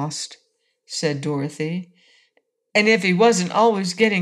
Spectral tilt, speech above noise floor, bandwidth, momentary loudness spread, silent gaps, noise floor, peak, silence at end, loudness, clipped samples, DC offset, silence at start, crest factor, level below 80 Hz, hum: -4.5 dB/octave; 47 dB; 12.5 kHz; 14 LU; none; -67 dBFS; -4 dBFS; 0 s; -20 LUFS; under 0.1%; under 0.1%; 0 s; 18 dB; -68 dBFS; none